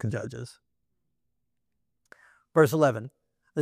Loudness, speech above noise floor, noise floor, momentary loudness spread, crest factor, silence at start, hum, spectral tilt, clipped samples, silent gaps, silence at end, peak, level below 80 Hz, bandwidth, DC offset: -25 LUFS; 57 dB; -82 dBFS; 22 LU; 22 dB; 0.05 s; none; -6.5 dB/octave; under 0.1%; none; 0 s; -8 dBFS; -68 dBFS; 16 kHz; under 0.1%